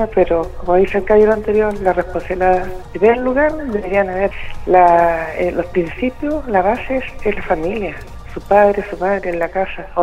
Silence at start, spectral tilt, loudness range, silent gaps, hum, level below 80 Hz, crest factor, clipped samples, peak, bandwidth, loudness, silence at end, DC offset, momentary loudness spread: 0 s; -7.5 dB/octave; 3 LU; none; none; -32 dBFS; 16 dB; under 0.1%; 0 dBFS; 12.5 kHz; -16 LUFS; 0 s; under 0.1%; 10 LU